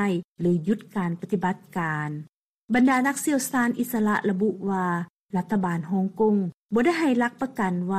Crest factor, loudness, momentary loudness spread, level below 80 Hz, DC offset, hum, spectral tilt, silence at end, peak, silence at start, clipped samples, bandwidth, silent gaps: 14 dB; -25 LUFS; 8 LU; -62 dBFS; under 0.1%; none; -6 dB/octave; 0 s; -10 dBFS; 0 s; under 0.1%; 14.5 kHz; 0.24-0.36 s, 2.29-2.68 s, 5.10-5.24 s, 6.54-6.69 s